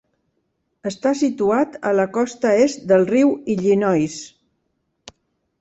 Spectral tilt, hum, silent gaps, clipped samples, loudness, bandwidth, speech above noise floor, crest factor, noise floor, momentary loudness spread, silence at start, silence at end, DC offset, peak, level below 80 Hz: -6 dB/octave; none; none; under 0.1%; -19 LUFS; 8.2 kHz; 53 dB; 16 dB; -71 dBFS; 11 LU; 0.85 s; 1.35 s; under 0.1%; -4 dBFS; -60 dBFS